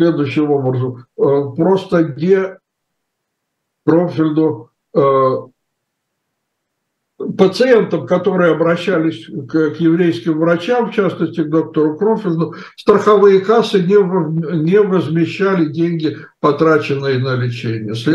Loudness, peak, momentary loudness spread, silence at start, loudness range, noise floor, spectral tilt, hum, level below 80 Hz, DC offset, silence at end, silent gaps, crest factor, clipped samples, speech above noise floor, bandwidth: -15 LUFS; 0 dBFS; 8 LU; 0 s; 4 LU; -74 dBFS; -8 dB/octave; none; -62 dBFS; under 0.1%; 0 s; none; 14 dB; under 0.1%; 60 dB; 10 kHz